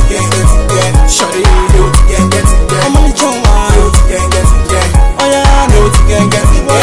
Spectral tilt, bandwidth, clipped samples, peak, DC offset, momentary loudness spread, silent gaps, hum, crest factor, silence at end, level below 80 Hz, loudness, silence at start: -4.5 dB/octave; 12 kHz; 3%; 0 dBFS; under 0.1%; 2 LU; none; none; 6 dB; 0 s; -8 dBFS; -9 LUFS; 0 s